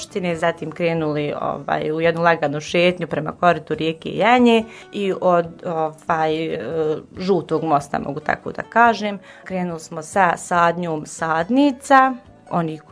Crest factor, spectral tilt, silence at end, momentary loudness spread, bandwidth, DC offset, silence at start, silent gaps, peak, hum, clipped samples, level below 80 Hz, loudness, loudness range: 20 dB; -5.5 dB/octave; 0.1 s; 11 LU; 11 kHz; under 0.1%; 0 s; none; 0 dBFS; none; under 0.1%; -56 dBFS; -20 LUFS; 3 LU